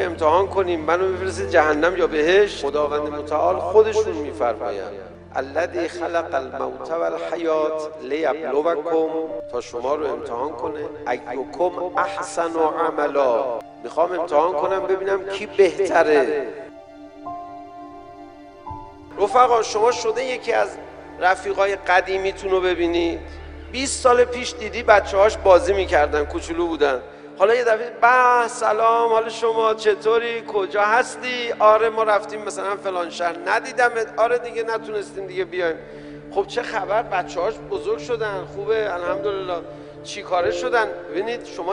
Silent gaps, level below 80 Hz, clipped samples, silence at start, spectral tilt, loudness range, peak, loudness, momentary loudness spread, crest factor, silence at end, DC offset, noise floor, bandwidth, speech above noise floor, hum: none; -46 dBFS; under 0.1%; 0 s; -4 dB/octave; 7 LU; 0 dBFS; -21 LUFS; 13 LU; 20 dB; 0 s; under 0.1%; -41 dBFS; 10.5 kHz; 21 dB; none